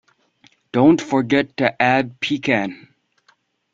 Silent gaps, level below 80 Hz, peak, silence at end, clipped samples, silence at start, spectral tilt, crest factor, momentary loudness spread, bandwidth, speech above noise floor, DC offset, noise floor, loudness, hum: none; -58 dBFS; -2 dBFS; 1 s; under 0.1%; 0.75 s; -6 dB/octave; 18 dB; 8 LU; 7.6 kHz; 43 dB; under 0.1%; -61 dBFS; -18 LUFS; none